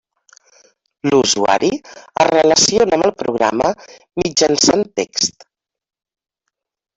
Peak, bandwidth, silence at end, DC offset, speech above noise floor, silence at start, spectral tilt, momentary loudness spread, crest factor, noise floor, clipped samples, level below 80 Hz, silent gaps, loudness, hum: -2 dBFS; 8.4 kHz; 1.65 s; under 0.1%; 62 dB; 1.05 s; -2.5 dB/octave; 12 LU; 16 dB; -78 dBFS; under 0.1%; -52 dBFS; none; -15 LUFS; none